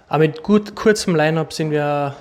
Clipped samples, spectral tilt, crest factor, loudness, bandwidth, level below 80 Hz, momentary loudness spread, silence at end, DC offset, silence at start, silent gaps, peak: under 0.1%; -6 dB/octave; 14 dB; -18 LUFS; 14.5 kHz; -50 dBFS; 5 LU; 0 s; under 0.1%; 0.1 s; none; -4 dBFS